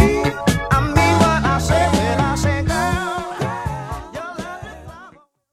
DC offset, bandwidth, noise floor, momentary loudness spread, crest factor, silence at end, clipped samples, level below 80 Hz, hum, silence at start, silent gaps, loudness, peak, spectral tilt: under 0.1%; 15.5 kHz; -46 dBFS; 16 LU; 18 dB; 0.45 s; under 0.1%; -30 dBFS; none; 0 s; none; -18 LUFS; 0 dBFS; -5.5 dB/octave